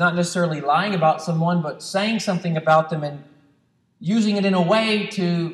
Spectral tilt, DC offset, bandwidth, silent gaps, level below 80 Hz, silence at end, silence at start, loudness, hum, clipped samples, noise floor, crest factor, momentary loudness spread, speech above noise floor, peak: -5.5 dB/octave; under 0.1%; 12 kHz; none; -70 dBFS; 0 s; 0 s; -20 LUFS; none; under 0.1%; -63 dBFS; 18 dB; 8 LU; 43 dB; -4 dBFS